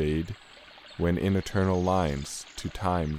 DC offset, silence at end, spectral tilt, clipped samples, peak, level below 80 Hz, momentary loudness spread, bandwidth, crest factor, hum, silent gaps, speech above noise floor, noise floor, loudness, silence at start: under 0.1%; 0 s; -6 dB/octave; under 0.1%; -12 dBFS; -44 dBFS; 18 LU; 15 kHz; 16 dB; none; none; 22 dB; -50 dBFS; -29 LUFS; 0 s